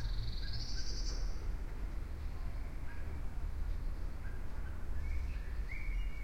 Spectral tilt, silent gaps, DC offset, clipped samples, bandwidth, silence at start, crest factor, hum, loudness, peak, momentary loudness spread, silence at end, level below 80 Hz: -4.5 dB/octave; none; under 0.1%; under 0.1%; 12 kHz; 0 s; 12 dB; none; -44 LUFS; -26 dBFS; 4 LU; 0 s; -40 dBFS